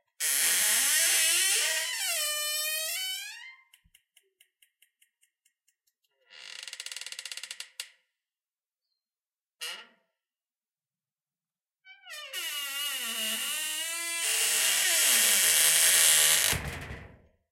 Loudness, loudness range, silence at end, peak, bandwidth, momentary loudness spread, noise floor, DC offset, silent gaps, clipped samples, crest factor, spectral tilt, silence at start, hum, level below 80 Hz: -24 LUFS; 25 LU; 0.45 s; -6 dBFS; 16.5 kHz; 21 LU; under -90 dBFS; under 0.1%; none; under 0.1%; 24 dB; 1.5 dB/octave; 0.2 s; none; -60 dBFS